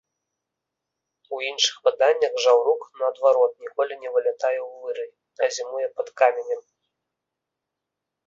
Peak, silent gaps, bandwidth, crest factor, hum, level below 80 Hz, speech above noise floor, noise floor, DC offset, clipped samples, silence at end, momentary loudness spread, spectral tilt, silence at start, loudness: -4 dBFS; none; 7.6 kHz; 20 dB; none; -78 dBFS; 62 dB; -84 dBFS; under 0.1%; under 0.1%; 1.65 s; 13 LU; 1 dB/octave; 1.3 s; -23 LUFS